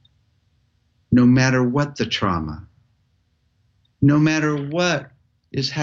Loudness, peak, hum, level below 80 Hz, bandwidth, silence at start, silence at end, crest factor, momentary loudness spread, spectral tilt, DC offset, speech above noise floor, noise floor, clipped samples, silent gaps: -19 LUFS; -4 dBFS; none; -48 dBFS; 7.4 kHz; 1.1 s; 0 s; 16 dB; 11 LU; -6 dB/octave; under 0.1%; 47 dB; -65 dBFS; under 0.1%; none